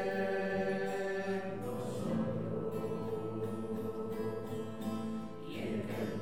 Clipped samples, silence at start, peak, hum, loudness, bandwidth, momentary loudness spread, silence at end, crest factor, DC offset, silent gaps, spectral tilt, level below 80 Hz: under 0.1%; 0 s; -24 dBFS; none; -38 LUFS; 16.5 kHz; 6 LU; 0 s; 14 dB; 0.4%; none; -7 dB/octave; -64 dBFS